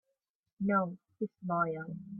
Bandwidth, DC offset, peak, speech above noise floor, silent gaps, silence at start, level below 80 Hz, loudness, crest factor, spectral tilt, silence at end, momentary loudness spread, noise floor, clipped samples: 2.6 kHz; under 0.1%; -18 dBFS; 51 dB; none; 0.6 s; -74 dBFS; -34 LUFS; 18 dB; -12.5 dB/octave; 0 s; 10 LU; -85 dBFS; under 0.1%